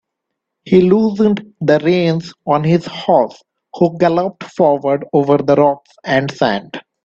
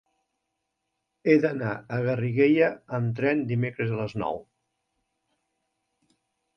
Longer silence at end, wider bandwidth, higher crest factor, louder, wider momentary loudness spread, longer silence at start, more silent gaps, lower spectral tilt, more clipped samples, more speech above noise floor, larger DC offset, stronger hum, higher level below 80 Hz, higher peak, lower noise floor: second, 0.25 s vs 2.15 s; first, 7.6 kHz vs 6.4 kHz; second, 14 dB vs 22 dB; first, -15 LUFS vs -26 LUFS; second, 6 LU vs 10 LU; second, 0.65 s vs 1.25 s; neither; second, -7.5 dB/octave vs -9 dB/octave; neither; first, 63 dB vs 56 dB; neither; neither; first, -54 dBFS vs -64 dBFS; first, 0 dBFS vs -6 dBFS; second, -77 dBFS vs -81 dBFS